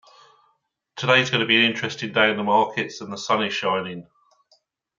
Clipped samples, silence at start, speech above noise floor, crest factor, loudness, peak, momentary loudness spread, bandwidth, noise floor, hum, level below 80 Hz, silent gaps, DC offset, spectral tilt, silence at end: under 0.1%; 0.95 s; 47 dB; 22 dB; -21 LUFS; -2 dBFS; 14 LU; 7.6 kHz; -69 dBFS; none; -70 dBFS; none; under 0.1%; -4 dB/octave; 0.95 s